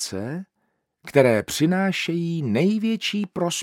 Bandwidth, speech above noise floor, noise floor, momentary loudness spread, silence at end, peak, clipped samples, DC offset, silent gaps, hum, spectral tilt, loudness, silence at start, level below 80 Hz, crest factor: 17 kHz; 51 dB; -73 dBFS; 10 LU; 0 s; -2 dBFS; under 0.1%; under 0.1%; none; none; -5 dB/octave; -22 LUFS; 0 s; -64 dBFS; 22 dB